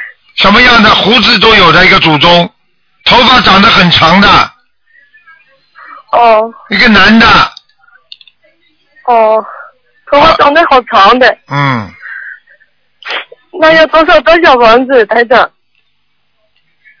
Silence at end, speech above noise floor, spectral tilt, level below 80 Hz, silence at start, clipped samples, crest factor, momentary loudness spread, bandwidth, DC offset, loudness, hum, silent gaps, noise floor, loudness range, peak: 1.55 s; 56 dB; -5 dB/octave; -32 dBFS; 0 s; 6%; 8 dB; 16 LU; 5.4 kHz; under 0.1%; -5 LUFS; none; none; -61 dBFS; 6 LU; 0 dBFS